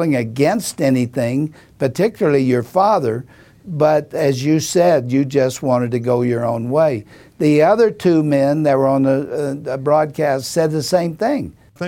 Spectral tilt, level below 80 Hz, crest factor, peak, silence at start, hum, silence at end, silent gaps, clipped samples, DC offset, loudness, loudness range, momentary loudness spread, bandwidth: -6.5 dB/octave; -54 dBFS; 16 dB; 0 dBFS; 0 s; none; 0 s; none; under 0.1%; under 0.1%; -17 LUFS; 2 LU; 8 LU; 17 kHz